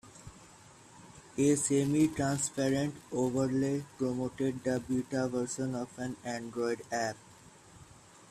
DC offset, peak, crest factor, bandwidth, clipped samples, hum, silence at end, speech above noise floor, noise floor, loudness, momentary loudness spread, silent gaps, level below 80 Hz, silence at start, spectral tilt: under 0.1%; -16 dBFS; 18 dB; 14.5 kHz; under 0.1%; none; 0.05 s; 24 dB; -56 dBFS; -32 LUFS; 13 LU; none; -64 dBFS; 0.05 s; -5.5 dB/octave